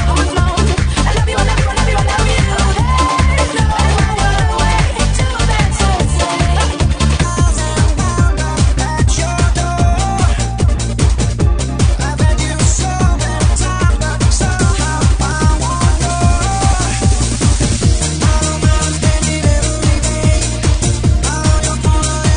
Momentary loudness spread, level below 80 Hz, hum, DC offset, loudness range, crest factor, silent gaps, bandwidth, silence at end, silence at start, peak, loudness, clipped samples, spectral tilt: 1 LU; -16 dBFS; none; 0.2%; 1 LU; 12 dB; none; 10.5 kHz; 0 s; 0 s; 0 dBFS; -14 LUFS; under 0.1%; -4.5 dB/octave